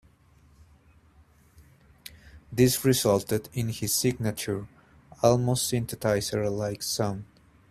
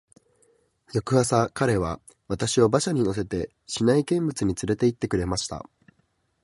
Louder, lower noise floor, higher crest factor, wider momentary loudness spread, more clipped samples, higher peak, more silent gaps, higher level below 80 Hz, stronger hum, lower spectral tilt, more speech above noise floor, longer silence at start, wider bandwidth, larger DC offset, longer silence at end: about the same, -26 LUFS vs -25 LUFS; second, -59 dBFS vs -70 dBFS; about the same, 20 dB vs 20 dB; first, 17 LU vs 11 LU; neither; about the same, -8 dBFS vs -6 dBFS; neither; second, -56 dBFS vs -48 dBFS; neither; about the same, -4.5 dB/octave vs -5.5 dB/octave; second, 33 dB vs 46 dB; first, 1.6 s vs 0.95 s; first, 15.5 kHz vs 11.5 kHz; neither; second, 0.45 s vs 0.85 s